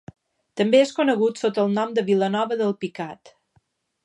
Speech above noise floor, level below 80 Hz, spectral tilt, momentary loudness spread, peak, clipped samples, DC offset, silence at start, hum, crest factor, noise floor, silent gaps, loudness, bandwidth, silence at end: 45 dB; -70 dBFS; -5.5 dB/octave; 13 LU; -6 dBFS; under 0.1%; under 0.1%; 0.55 s; none; 18 dB; -66 dBFS; none; -22 LUFS; 10.5 kHz; 0.9 s